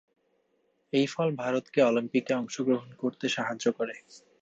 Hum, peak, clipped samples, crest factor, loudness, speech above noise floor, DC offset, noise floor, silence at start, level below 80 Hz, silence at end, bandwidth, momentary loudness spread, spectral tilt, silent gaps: none; -12 dBFS; under 0.1%; 18 dB; -29 LUFS; 44 dB; under 0.1%; -72 dBFS; 0.95 s; -78 dBFS; 0.25 s; 8 kHz; 9 LU; -5 dB/octave; none